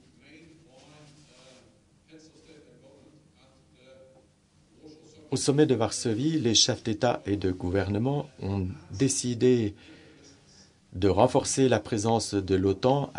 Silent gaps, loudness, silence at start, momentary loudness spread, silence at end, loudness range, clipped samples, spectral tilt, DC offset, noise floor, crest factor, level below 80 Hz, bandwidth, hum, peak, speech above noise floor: none; -26 LUFS; 2.15 s; 10 LU; 0 s; 5 LU; under 0.1%; -4.5 dB/octave; under 0.1%; -62 dBFS; 22 dB; -62 dBFS; 11 kHz; none; -6 dBFS; 37 dB